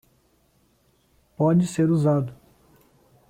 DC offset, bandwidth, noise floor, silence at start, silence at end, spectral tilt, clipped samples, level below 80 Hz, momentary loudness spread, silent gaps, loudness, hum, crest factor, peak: under 0.1%; 13.5 kHz; -64 dBFS; 1.4 s; 0.95 s; -8 dB/octave; under 0.1%; -60 dBFS; 5 LU; none; -22 LUFS; none; 16 dB; -10 dBFS